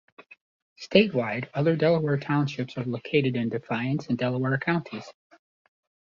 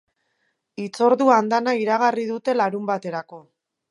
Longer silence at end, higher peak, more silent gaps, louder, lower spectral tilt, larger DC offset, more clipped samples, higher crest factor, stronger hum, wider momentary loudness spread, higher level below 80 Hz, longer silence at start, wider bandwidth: first, 0.9 s vs 0.5 s; about the same, -4 dBFS vs -2 dBFS; first, 0.41-0.76 s vs none; second, -26 LUFS vs -20 LUFS; first, -7.5 dB/octave vs -5.5 dB/octave; neither; neither; about the same, 22 dB vs 20 dB; neither; second, 10 LU vs 16 LU; first, -66 dBFS vs -78 dBFS; second, 0.2 s vs 0.8 s; second, 7.2 kHz vs 11.5 kHz